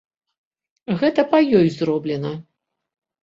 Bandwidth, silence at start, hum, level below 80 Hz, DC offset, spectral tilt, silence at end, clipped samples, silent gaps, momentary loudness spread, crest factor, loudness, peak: 7.6 kHz; 0.9 s; none; -60 dBFS; under 0.1%; -8 dB/octave; 0.8 s; under 0.1%; none; 15 LU; 18 dB; -19 LUFS; -2 dBFS